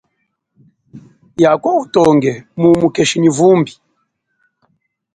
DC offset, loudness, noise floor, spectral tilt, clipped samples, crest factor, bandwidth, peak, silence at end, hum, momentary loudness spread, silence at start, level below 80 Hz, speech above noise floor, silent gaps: under 0.1%; -13 LUFS; -69 dBFS; -5.5 dB/octave; under 0.1%; 14 dB; 11 kHz; 0 dBFS; 1.45 s; none; 6 LU; 0.95 s; -52 dBFS; 57 dB; none